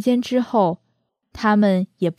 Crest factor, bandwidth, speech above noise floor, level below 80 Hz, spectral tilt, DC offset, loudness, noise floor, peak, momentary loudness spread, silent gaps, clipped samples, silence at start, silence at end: 14 dB; 13.5 kHz; 51 dB; -56 dBFS; -7 dB/octave; under 0.1%; -19 LUFS; -70 dBFS; -6 dBFS; 6 LU; none; under 0.1%; 0 s; 0.05 s